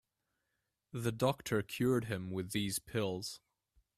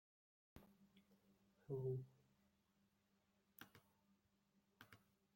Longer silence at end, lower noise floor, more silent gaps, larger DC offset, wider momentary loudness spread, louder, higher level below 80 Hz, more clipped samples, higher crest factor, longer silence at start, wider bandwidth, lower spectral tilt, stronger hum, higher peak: first, 0.6 s vs 0.4 s; about the same, -86 dBFS vs -83 dBFS; neither; neither; second, 10 LU vs 21 LU; first, -37 LUFS vs -50 LUFS; first, -66 dBFS vs -86 dBFS; neither; about the same, 22 dB vs 22 dB; first, 0.95 s vs 0.55 s; about the same, 15.5 kHz vs 16.5 kHz; second, -5 dB/octave vs -8 dB/octave; neither; first, -16 dBFS vs -36 dBFS